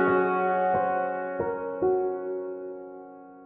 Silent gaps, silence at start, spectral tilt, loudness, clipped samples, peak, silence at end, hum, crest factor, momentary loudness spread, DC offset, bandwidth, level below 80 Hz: none; 0 s; -10 dB/octave; -27 LUFS; under 0.1%; -14 dBFS; 0 s; none; 14 dB; 17 LU; under 0.1%; 4 kHz; -64 dBFS